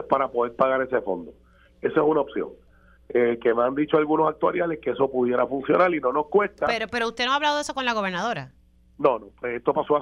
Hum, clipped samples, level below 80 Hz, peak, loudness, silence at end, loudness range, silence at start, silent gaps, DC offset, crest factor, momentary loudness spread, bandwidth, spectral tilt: none; under 0.1%; -58 dBFS; -4 dBFS; -24 LUFS; 0 s; 3 LU; 0 s; none; under 0.1%; 20 dB; 8 LU; 11.5 kHz; -5 dB/octave